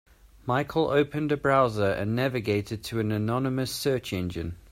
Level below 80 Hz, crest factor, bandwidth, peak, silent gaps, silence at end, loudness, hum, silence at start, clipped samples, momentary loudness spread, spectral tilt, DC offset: -52 dBFS; 18 dB; 16 kHz; -10 dBFS; none; 0.15 s; -27 LUFS; none; 0.45 s; under 0.1%; 9 LU; -6 dB/octave; under 0.1%